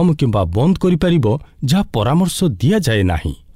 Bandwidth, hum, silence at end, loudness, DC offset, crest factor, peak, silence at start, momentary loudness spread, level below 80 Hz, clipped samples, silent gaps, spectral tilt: 16 kHz; none; 0.2 s; -16 LUFS; 0.5%; 10 dB; -6 dBFS; 0 s; 4 LU; -32 dBFS; under 0.1%; none; -6.5 dB/octave